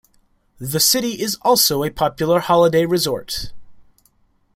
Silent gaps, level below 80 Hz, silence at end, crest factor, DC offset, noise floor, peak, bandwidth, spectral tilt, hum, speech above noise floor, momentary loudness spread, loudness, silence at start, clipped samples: none; -46 dBFS; 0.75 s; 18 dB; under 0.1%; -59 dBFS; -2 dBFS; 16.5 kHz; -3.5 dB/octave; none; 42 dB; 13 LU; -17 LUFS; 0.6 s; under 0.1%